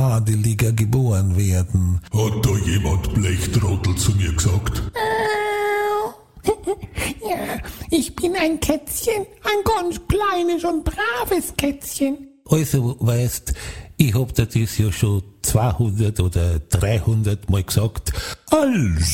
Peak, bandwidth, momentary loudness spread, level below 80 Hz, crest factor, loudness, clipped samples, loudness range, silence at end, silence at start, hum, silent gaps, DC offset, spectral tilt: 0 dBFS; 17 kHz; 6 LU; -34 dBFS; 20 dB; -21 LUFS; under 0.1%; 3 LU; 0 s; 0 s; none; none; 0.2%; -5.5 dB/octave